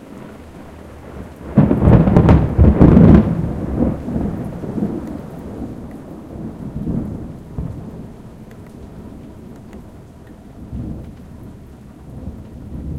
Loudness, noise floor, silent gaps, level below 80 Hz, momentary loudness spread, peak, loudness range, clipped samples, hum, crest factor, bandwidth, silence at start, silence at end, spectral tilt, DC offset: -14 LUFS; -39 dBFS; none; -26 dBFS; 26 LU; 0 dBFS; 22 LU; 0.1%; none; 18 dB; 6.6 kHz; 0.1 s; 0 s; -10.5 dB/octave; under 0.1%